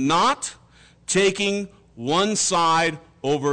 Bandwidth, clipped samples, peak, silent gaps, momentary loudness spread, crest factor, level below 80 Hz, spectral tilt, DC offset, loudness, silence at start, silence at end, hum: 9.6 kHz; under 0.1%; -12 dBFS; none; 14 LU; 10 dB; -56 dBFS; -3 dB/octave; under 0.1%; -21 LUFS; 0 s; 0 s; none